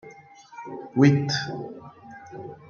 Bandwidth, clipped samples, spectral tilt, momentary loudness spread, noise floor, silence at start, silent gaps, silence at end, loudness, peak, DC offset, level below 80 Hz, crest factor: 7.2 kHz; under 0.1%; -6.5 dB/octave; 25 LU; -48 dBFS; 0.05 s; none; 0.15 s; -22 LUFS; -4 dBFS; under 0.1%; -66 dBFS; 22 dB